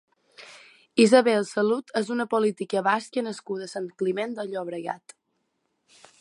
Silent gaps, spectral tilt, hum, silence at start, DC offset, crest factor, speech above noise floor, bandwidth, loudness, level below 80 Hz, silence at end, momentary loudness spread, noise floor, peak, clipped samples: none; -4.5 dB/octave; none; 0.4 s; under 0.1%; 22 dB; 51 dB; 11.5 kHz; -25 LUFS; -80 dBFS; 1.25 s; 16 LU; -75 dBFS; -4 dBFS; under 0.1%